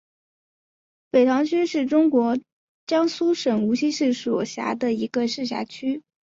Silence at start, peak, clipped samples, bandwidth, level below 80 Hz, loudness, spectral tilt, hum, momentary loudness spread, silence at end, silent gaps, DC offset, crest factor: 1.15 s; -6 dBFS; under 0.1%; 7.8 kHz; -68 dBFS; -23 LUFS; -5 dB/octave; none; 10 LU; 0.4 s; 2.52-2.87 s; under 0.1%; 16 dB